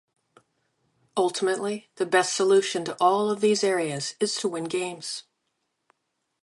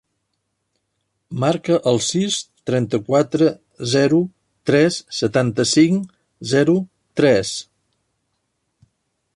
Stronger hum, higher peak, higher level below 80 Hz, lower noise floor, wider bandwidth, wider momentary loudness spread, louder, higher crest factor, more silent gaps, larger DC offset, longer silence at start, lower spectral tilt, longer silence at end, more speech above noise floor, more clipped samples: neither; second, -8 dBFS vs -2 dBFS; second, -80 dBFS vs -58 dBFS; first, -78 dBFS vs -73 dBFS; about the same, 11.5 kHz vs 11.5 kHz; about the same, 11 LU vs 12 LU; second, -25 LUFS vs -18 LUFS; about the same, 20 dB vs 16 dB; neither; neither; second, 1.15 s vs 1.3 s; second, -3.5 dB/octave vs -5 dB/octave; second, 1.2 s vs 1.75 s; about the same, 54 dB vs 56 dB; neither